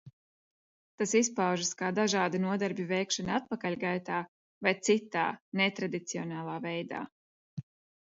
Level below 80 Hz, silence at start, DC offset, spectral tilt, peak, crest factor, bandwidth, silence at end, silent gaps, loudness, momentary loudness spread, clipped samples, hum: -72 dBFS; 0.05 s; under 0.1%; -4 dB/octave; -12 dBFS; 20 dB; 8 kHz; 0.4 s; 0.13-0.98 s, 4.28-4.61 s, 5.41-5.52 s, 7.12-7.57 s; -31 LUFS; 12 LU; under 0.1%; none